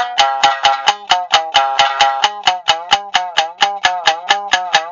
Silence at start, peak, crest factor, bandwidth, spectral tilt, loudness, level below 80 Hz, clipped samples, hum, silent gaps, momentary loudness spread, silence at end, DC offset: 0 s; 0 dBFS; 14 dB; 7.8 kHz; 1 dB/octave; -14 LUFS; -54 dBFS; under 0.1%; none; none; 4 LU; 0 s; under 0.1%